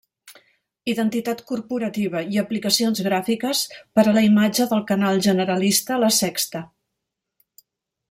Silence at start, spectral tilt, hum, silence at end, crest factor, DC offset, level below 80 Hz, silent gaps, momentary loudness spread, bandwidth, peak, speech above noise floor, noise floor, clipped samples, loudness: 0.25 s; -4 dB/octave; none; 1.45 s; 18 dB; under 0.1%; -64 dBFS; none; 10 LU; 16.5 kHz; -2 dBFS; 61 dB; -81 dBFS; under 0.1%; -20 LUFS